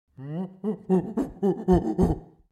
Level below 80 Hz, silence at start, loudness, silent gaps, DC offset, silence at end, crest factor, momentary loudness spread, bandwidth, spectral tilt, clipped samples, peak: -40 dBFS; 0.2 s; -26 LUFS; none; under 0.1%; 0.25 s; 18 dB; 12 LU; 11.5 kHz; -9.5 dB/octave; under 0.1%; -8 dBFS